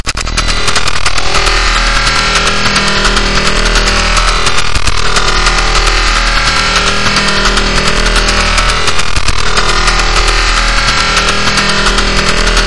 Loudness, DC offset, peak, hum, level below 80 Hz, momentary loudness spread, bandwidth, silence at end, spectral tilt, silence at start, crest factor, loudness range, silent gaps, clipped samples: -9 LUFS; under 0.1%; 0 dBFS; none; -16 dBFS; 3 LU; 12 kHz; 0 s; -2 dB/octave; 0 s; 10 dB; 1 LU; none; 0.5%